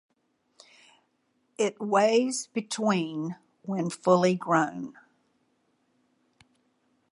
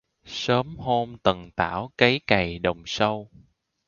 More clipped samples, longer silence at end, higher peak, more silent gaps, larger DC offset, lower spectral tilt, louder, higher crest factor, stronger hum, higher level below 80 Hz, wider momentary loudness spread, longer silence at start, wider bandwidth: neither; first, 2.2 s vs 0.6 s; second, -8 dBFS vs 0 dBFS; neither; neither; about the same, -5 dB/octave vs -5 dB/octave; second, -27 LUFS vs -24 LUFS; about the same, 22 dB vs 24 dB; neither; second, -80 dBFS vs -50 dBFS; first, 14 LU vs 7 LU; first, 1.6 s vs 0.25 s; first, 11.5 kHz vs 7.2 kHz